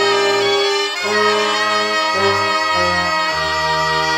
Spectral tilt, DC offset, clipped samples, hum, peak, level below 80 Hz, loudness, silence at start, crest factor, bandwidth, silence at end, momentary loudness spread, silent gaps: -2.5 dB/octave; under 0.1%; under 0.1%; none; -2 dBFS; -48 dBFS; -15 LUFS; 0 s; 14 dB; 16 kHz; 0 s; 2 LU; none